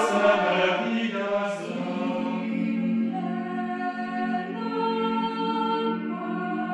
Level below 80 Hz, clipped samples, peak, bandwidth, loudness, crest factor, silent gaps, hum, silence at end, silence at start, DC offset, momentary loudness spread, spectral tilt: -78 dBFS; under 0.1%; -8 dBFS; 10.5 kHz; -26 LUFS; 18 dB; none; none; 0 s; 0 s; under 0.1%; 8 LU; -6 dB/octave